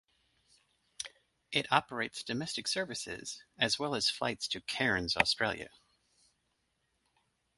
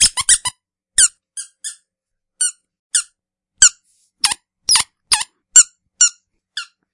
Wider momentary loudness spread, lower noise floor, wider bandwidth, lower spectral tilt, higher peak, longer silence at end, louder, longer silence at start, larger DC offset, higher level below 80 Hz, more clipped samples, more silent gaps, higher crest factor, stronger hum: second, 15 LU vs 20 LU; about the same, -79 dBFS vs -80 dBFS; about the same, 12 kHz vs 12 kHz; first, -2.5 dB/octave vs 3.5 dB/octave; second, -8 dBFS vs 0 dBFS; first, 1.9 s vs 0.3 s; second, -33 LUFS vs -14 LUFS; first, 1 s vs 0 s; neither; second, -64 dBFS vs -50 dBFS; second, under 0.1% vs 0.2%; second, none vs 2.79-2.90 s; first, 28 dB vs 18 dB; neither